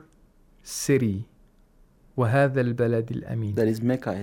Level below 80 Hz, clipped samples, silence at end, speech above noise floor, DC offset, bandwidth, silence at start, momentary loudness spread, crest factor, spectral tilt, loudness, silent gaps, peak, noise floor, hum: -56 dBFS; under 0.1%; 0 s; 33 dB; under 0.1%; 16.5 kHz; 0.65 s; 13 LU; 16 dB; -6.5 dB/octave; -25 LUFS; none; -10 dBFS; -57 dBFS; none